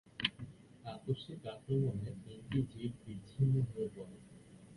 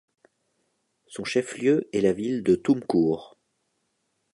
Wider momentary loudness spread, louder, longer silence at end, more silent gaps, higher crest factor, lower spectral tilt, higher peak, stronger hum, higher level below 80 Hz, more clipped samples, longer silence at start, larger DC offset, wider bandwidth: first, 19 LU vs 9 LU; second, -39 LUFS vs -25 LUFS; second, 0 s vs 1.05 s; neither; first, 24 dB vs 18 dB; first, -7.5 dB/octave vs -6 dB/octave; second, -14 dBFS vs -8 dBFS; neither; about the same, -62 dBFS vs -62 dBFS; neither; second, 0.2 s vs 1.1 s; neither; about the same, 11.5 kHz vs 11.5 kHz